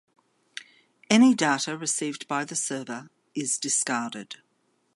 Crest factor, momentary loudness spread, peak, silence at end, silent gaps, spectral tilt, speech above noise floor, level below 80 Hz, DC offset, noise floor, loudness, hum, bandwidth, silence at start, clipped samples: 22 dB; 23 LU; -4 dBFS; 0.6 s; none; -2.5 dB/octave; 45 dB; -78 dBFS; under 0.1%; -71 dBFS; -25 LUFS; none; 11.5 kHz; 0.55 s; under 0.1%